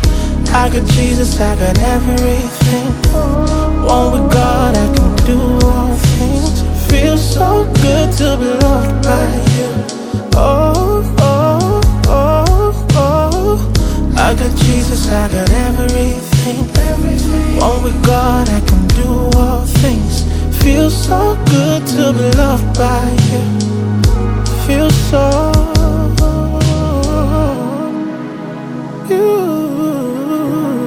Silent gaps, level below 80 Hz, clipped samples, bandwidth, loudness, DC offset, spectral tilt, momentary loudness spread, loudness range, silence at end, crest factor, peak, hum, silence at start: none; -16 dBFS; under 0.1%; 18 kHz; -12 LUFS; under 0.1%; -6 dB/octave; 5 LU; 2 LU; 0 s; 10 dB; 0 dBFS; none; 0 s